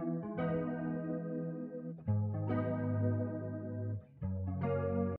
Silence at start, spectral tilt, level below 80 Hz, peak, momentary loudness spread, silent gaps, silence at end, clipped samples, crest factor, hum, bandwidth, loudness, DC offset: 0 s; -12 dB/octave; -64 dBFS; -24 dBFS; 7 LU; none; 0 s; under 0.1%; 14 dB; none; 3.2 kHz; -38 LUFS; under 0.1%